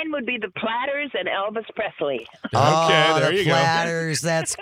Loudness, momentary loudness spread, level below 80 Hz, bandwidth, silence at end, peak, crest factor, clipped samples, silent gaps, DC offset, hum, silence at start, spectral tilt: -21 LUFS; 11 LU; -62 dBFS; 16 kHz; 0 s; -2 dBFS; 20 dB; under 0.1%; none; under 0.1%; none; 0 s; -4 dB/octave